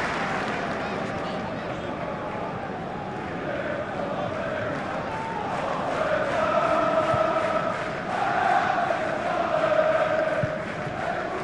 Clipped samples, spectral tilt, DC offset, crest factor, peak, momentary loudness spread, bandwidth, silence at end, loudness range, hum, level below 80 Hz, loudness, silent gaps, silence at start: under 0.1%; -5.5 dB/octave; under 0.1%; 16 dB; -10 dBFS; 9 LU; 11 kHz; 0 s; 7 LU; none; -54 dBFS; -26 LUFS; none; 0 s